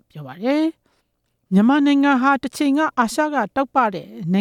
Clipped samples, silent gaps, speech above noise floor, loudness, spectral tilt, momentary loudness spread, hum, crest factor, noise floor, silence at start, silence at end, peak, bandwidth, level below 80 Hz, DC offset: under 0.1%; none; 52 dB; -19 LUFS; -6 dB/octave; 8 LU; none; 14 dB; -70 dBFS; 0.15 s; 0 s; -4 dBFS; 15 kHz; -62 dBFS; under 0.1%